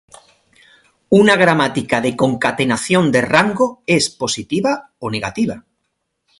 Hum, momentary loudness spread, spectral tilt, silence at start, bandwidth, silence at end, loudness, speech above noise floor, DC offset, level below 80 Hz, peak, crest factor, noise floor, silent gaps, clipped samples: none; 10 LU; -4.5 dB/octave; 1.1 s; 11.5 kHz; 0.8 s; -16 LUFS; 56 dB; under 0.1%; -52 dBFS; 0 dBFS; 18 dB; -72 dBFS; none; under 0.1%